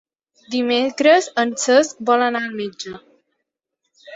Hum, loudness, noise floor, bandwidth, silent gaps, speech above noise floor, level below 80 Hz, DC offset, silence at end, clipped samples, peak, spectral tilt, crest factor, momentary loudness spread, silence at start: none; -18 LUFS; -78 dBFS; 8.2 kHz; none; 60 dB; -68 dBFS; under 0.1%; 0 s; under 0.1%; -2 dBFS; -2.5 dB/octave; 18 dB; 14 LU; 0.5 s